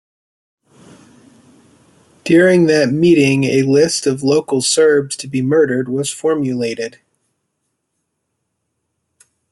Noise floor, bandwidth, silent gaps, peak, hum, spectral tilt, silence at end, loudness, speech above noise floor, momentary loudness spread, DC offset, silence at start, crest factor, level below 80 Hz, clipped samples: -72 dBFS; 12 kHz; none; -2 dBFS; none; -5 dB/octave; 2.65 s; -14 LUFS; 59 dB; 10 LU; under 0.1%; 2.25 s; 16 dB; -58 dBFS; under 0.1%